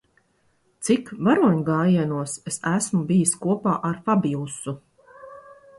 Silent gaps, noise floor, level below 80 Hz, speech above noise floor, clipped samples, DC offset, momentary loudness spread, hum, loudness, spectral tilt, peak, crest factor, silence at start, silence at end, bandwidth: none; -65 dBFS; -62 dBFS; 43 dB; under 0.1%; under 0.1%; 13 LU; none; -22 LUFS; -6 dB/octave; -6 dBFS; 18 dB; 0.8 s; 0.25 s; 11.5 kHz